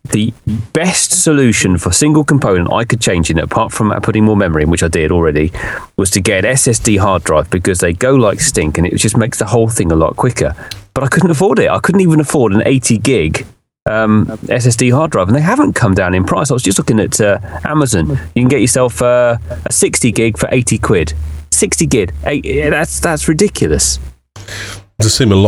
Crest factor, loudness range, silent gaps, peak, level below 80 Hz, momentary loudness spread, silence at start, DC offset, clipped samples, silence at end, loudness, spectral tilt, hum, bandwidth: 12 dB; 2 LU; 13.82-13.86 s; 0 dBFS; -30 dBFS; 7 LU; 0.1 s; under 0.1%; under 0.1%; 0 s; -12 LUFS; -4.5 dB/octave; none; 14 kHz